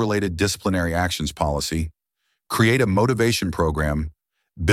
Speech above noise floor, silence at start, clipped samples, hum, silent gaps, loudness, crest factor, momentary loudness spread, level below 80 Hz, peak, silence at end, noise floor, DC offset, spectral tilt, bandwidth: 54 dB; 0 s; under 0.1%; none; none; -22 LUFS; 18 dB; 10 LU; -38 dBFS; -4 dBFS; 0 s; -75 dBFS; under 0.1%; -5 dB/octave; 16 kHz